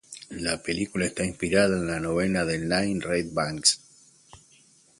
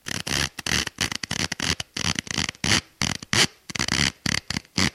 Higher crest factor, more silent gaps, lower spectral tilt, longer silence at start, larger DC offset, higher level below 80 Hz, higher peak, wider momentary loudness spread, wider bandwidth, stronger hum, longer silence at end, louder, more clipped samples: about the same, 22 dB vs 22 dB; neither; first, -3.5 dB/octave vs -2 dB/octave; about the same, 0.1 s vs 0.05 s; neither; second, -50 dBFS vs -44 dBFS; about the same, -6 dBFS vs -4 dBFS; about the same, 7 LU vs 6 LU; second, 11.5 kHz vs 16 kHz; neither; first, 0.65 s vs 0.05 s; about the same, -26 LUFS vs -24 LUFS; neither